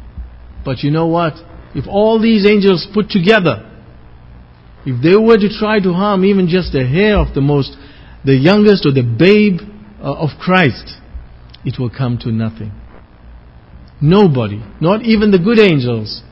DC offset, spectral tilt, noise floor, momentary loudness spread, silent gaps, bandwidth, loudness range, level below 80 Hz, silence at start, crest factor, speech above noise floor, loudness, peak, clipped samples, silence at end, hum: under 0.1%; -8.5 dB/octave; -39 dBFS; 16 LU; none; 6.8 kHz; 6 LU; -34 dBFS; 0 s; 14 dB; 27 dB; -12 LUFS; 0 dBFS; 0.2%; 0.1 s; none